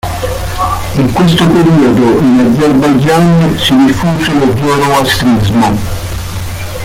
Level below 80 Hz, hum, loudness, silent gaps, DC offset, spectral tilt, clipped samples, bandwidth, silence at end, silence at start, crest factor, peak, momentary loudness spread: -26 dBFS; none; -9 LUFS; none; under 0.1%; -6 dB/octave; under 0.1%; 16.5 kHz; 0 s; 0.05 s; 8 dB; 0 dBFS; 11 LU